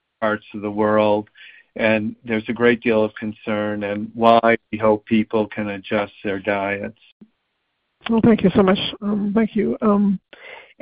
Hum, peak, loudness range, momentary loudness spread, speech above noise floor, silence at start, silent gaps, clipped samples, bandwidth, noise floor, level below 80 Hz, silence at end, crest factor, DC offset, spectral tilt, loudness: none; 0 dBFS; 4 LU; 12 LU; 53 dB; 0.2 s; 7.12-7.20 s; under 0.1%; 5 kHz; -73 dBFS; -52 dBFS; 0.2 s; 20 dB; under 0.1%; -9.5 dB/octave; -20 LUFS